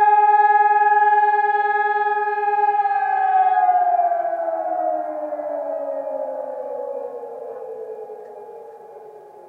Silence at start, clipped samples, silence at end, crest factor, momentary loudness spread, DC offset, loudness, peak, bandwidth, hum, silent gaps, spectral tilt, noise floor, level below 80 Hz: 0 s; under 0.1%; 0 s; 14 dB; 18 LU; under 0.1%; -19 LUFS; -6 dBFS; 4.4 kHz; none; none; -4.5 dB/octave; -41 dBFS; under -90 dBFS